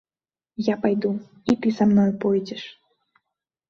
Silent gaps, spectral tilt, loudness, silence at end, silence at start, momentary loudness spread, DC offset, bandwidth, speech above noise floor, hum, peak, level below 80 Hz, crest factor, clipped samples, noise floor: none; -7.5 dB/octave; -22 LUFS; 1 s; 0.6 s; 17 LU; under 0.1%; 7 kHz; over 68 dB; none; -6 dBFS; -60 dBFS; 18 dB; under 0.1%; under -90 dBFS